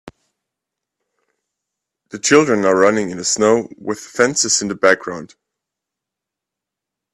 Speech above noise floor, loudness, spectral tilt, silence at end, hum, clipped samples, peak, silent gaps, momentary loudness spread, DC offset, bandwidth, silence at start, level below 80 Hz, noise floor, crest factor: 68 dB; -15 LUFS; -3 dB/octave; 1.9 s; none; under 0.1%; 0 dBFS; none; 13 LU; under 0.1%; 12.5 kHz; 0.05 s; -60 dBFS; -84 dBFS; 20 dB